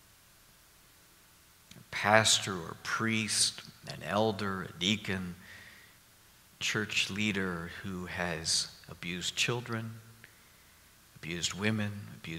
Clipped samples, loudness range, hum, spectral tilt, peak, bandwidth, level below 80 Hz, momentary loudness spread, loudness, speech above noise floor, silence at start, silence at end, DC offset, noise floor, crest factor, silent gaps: under 0.1%; 6 LU; none; -3 dB/octave; -6 dBFS; 16 kHz; -64 dBFS; 18 LU; -31 LUFS; 28 dB; 1.7 s; 0 s; under 0.1%; -61 dBFS; 30 dB; none